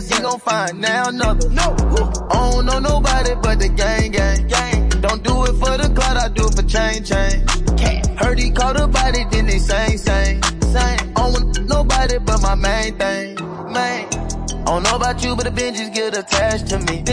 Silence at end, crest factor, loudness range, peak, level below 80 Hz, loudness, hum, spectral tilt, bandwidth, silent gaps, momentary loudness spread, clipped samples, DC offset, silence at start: 0 s; 12 dB; 2 LU; -4 dBFS; -18 dBFS; -18 LUFS; none; -4 dB/octave; 10.5 kHz; none; 4 LU; under 0.1%; under 0.1%; 0 s